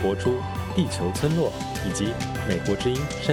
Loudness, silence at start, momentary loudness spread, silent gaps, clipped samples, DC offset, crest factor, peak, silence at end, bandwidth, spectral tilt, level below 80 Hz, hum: -26 LUFS; 0 s; 4 LU; none; under 0.1%; under 0.1%; 18 dB; -8 dBFS; 0 s; 17.5 kHz; -5.5 dB/octave; -42 dBFS; none